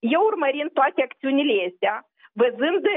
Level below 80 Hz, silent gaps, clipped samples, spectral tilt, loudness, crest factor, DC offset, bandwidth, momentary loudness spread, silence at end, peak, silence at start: -90 dBFS; none; under 0.1%; -8.5 dB/octave; -22 LUFS; 14 dB; under 0.1%; 3.9 kHz; 5 LU; 0 s; -8 dBFS; 0.05 s